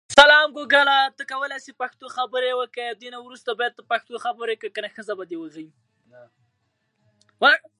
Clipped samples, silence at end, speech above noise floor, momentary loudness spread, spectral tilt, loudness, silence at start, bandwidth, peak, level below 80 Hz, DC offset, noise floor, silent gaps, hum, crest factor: under 0.1%; 0.2 s; 48 dB; 18 LU; -1 dB/octave; -21 LUFS; 0.1 s; 11.5 kHz; 0 dBFS; -62 dBFS; under 0.1%; -72 dBFS; none; none; 22 dB